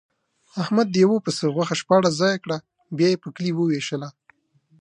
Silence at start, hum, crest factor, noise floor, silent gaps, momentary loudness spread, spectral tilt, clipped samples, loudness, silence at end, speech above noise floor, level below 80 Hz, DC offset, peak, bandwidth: 0.55 s; none; 18 dB; -61 dBFS; none; 13 LU; -5.5 dB/octave; under 0.1%; -22 LUFS; 0.7 s; 39 dB; -70 dBFS; under 0.1%; -4 dBFS; 10.5 kHz